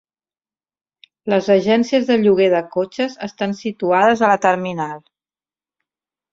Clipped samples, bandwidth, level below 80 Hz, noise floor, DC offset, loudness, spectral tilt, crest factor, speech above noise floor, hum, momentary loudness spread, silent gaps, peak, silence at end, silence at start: under 0.1%; 7.8 kHz; -62 dBFS; under -90 dBFS; under 0.1%; -17 LUFS; -6 dB/octave; 16 dB; over 74 dB; none; 11 LU; none; -2 dBFS; 1.35 s; 1.25 s